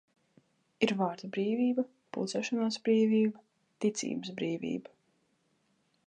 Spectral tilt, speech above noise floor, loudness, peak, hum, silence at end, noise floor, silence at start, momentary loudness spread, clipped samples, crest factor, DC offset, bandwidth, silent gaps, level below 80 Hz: -5 dB/octave; 43 dB; -32 LUFS; -12 dBFS; none; 1.25 s; -74 dBFS; 0.8 s; 9 LU; under 0.1%; 22 dB; under 0.1%; 9.6 kHz; none; -82 dBFS